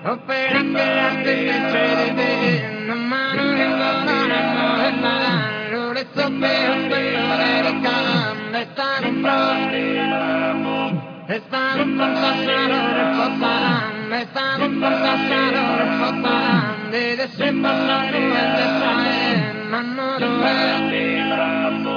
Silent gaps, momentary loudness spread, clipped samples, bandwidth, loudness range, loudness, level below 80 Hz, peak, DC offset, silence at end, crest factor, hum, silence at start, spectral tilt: none; 5 LU; under 0.1%; 5.4 kHz; 1 LU; -19 LUFS; -74 dBFS; -4 dBFS; under 0.1%; 0 s; 16 dB; none; 0 s; -6.5 dB/octave